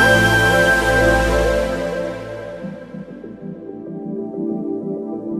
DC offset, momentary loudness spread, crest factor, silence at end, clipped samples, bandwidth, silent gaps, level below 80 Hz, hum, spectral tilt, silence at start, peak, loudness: under 0.1%; 20 LU; 16 dB; 0 s; under 0.1%; 14.5 kHz; none; -30 dBFS; none; -5 dB/octave; 0 s; -2 dBFS; -17 LUFS